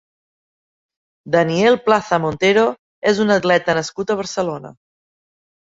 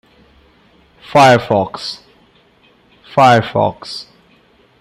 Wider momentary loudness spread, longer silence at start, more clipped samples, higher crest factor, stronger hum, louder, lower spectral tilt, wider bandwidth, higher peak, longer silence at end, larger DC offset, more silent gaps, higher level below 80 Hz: second, 8 LU vs 19 LU; first, 1.25 s vs 1.1 s; neither; about the same, 18 dB vs 16 dB; neither; second, -17 LUFS vs -13 LUFS; about the same, -5 dB/octave vs -5.5 dB/octave; second, 8 kHz vs 16 kHz; about the same, -2 dBFS vs 0 dBFS; first, 1.05 s vs 0.8 s; neither; first, 2.79-3.02 s vs none; about the same, -56 dBFS vs -54 dBFS